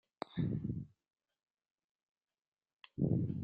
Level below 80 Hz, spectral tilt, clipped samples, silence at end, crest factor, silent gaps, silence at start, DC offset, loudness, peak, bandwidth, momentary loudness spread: -64 dBFS; -10 dB/octave; under 0.1%; 0 s; 20 dB; 1.50-1.58 s, 1.71-1.76 s, 1.84-2.15 s, 2.48-2.52 s, 2.73-2.77 s; 0.3 s; under 0.1%; -39 LUFS; -22 dBFS; 8.2 kHz; 15 LU